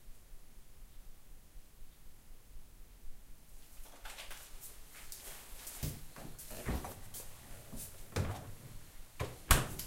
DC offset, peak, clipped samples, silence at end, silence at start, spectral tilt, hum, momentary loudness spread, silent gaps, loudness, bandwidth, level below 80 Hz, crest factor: under 0.1%; -8 dBFS; under 0.1%; 0 s; 0 s; -3.5 dB/octave; none; 20 LU; none; -42 LUFS; 16 kHz; -46 dBFS; 34 dB